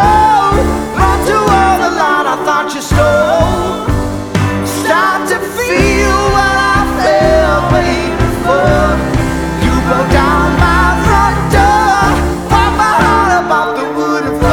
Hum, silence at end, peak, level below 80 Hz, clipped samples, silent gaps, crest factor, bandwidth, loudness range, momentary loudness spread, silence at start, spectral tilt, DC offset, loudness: none; 0 s; 0 dBFS; -20 dBFS; under 0.1%; none; 10 dB; 19.5 kHz; 2 LU; 6 LU; 0 s; -5.5 dB/octave; under 0.1%; -11 LUFS